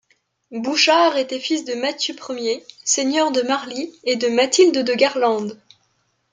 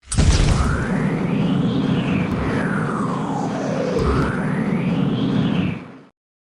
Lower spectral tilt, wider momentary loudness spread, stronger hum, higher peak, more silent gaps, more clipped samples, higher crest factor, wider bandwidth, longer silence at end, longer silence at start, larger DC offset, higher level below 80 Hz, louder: second, -1.5 dB/octave vs -6.5 dB/octave; first, 11 LU vs 5 LU; neither; about the same, -2 dBFS vs -4 dBFS; neither; neither; about the same, 18 dB vs 16 dB; second, 9.6 kHz vs 11.5 kHz; first, 0.8 s vs 0.45 s; first, 0.5 s vs 0.05 s; neither; second, -72 dBFS vs -28 dBFS; about the same, -19 LUFS vs -20 LUFS